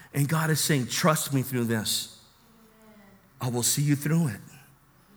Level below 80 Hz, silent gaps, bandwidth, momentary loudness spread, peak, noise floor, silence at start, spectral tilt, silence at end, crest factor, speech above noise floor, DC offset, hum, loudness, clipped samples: -64 dBFS; none; over 20 kHz; 8 LU; -8 dBFS; -58 dBFS; 0 s; -4 dB/octave; 0.6 s; 20 dB; 32 dB; under 0.1%; none; -26 LUFS; under 0.1%